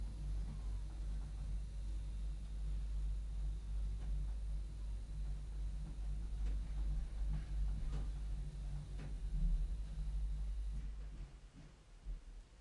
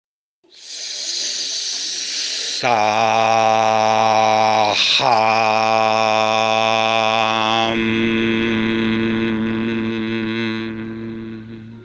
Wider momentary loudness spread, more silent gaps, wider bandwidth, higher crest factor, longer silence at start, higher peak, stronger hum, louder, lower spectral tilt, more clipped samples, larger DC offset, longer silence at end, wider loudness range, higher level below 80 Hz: second, 9 LU vs 12 LU; neither; about the same, 10.5 kHz vs 10 kHz; about the same, 14 dB vs 16 dB; second, 0 s vs 0.55 s; second, -28 dBFS vs -2 dBFS; neither; second, -46 LUFS vs -17 LUFS; first, -7 dB/octave vs -3.5 dB/octave; neither; neither; about the same, 0.05 s vs 0 s; second, 2 LU vs 5 LU; first, -42 dBFS vs -52 dBFS